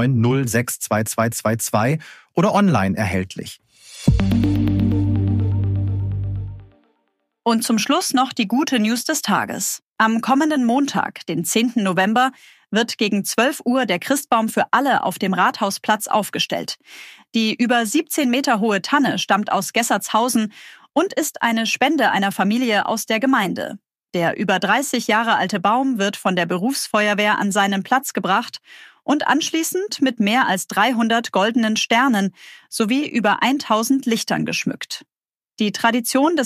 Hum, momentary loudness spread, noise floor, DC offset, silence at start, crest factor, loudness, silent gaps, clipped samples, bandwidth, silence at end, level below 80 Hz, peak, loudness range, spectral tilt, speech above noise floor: none; 7 LU; -70 dBFS; under 0.1%; 0 s; 18 dB; -19 LUFS; 9.82-9.90 s; under 0.1%; 15.5 kHz; 0 s; -42 dBFS; -2 dBFS; 2 LU; -4.5 dB/octave; 51 dB